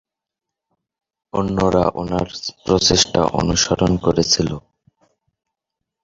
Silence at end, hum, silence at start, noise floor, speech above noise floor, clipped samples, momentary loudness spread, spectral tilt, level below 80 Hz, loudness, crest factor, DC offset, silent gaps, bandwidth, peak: 1.45 s; none; 1.35 s; -84 dBFS; 67 dB; under 0.1%; 11 LU; -4 dB/octave; -38 dBFS; -18 LUFS; 20 dB; under 0.1%; none; 8 kHz; 0 dBFS